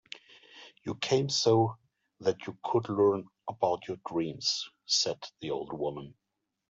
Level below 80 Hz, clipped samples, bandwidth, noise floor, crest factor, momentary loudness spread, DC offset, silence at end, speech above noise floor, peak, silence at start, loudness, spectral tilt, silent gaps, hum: -70 dBFS; under 0.1%; 8 kHz; -54 dBFS; 20 dB; 17 LU; under 0.1%; 0.6 s; 24 dB; -12 dBFS; 0.55 s; -30 LUFS; -4 dB/octave; none; none